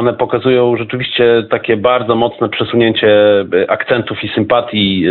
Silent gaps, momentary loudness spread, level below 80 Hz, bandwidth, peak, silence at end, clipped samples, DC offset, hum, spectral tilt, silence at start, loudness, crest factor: none; 6 LU; -50 dBFS; 4.4 kHz; 0 dBFS; 0 s; under 0.1%; under 0.1%; none; -10.5 dB/octave; 0 s; -12 LUFS; 12 dB